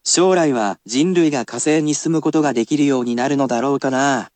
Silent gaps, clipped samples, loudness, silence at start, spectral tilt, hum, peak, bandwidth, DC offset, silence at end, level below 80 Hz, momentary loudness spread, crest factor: none; under 0.1%; -17 LUFS; 0.05 s; -4 dB/octave; none; -2 dBFS; 9.2 kHz; under 0.1%; 0.1 s; -72 dBFS; 4 LU; 14 dB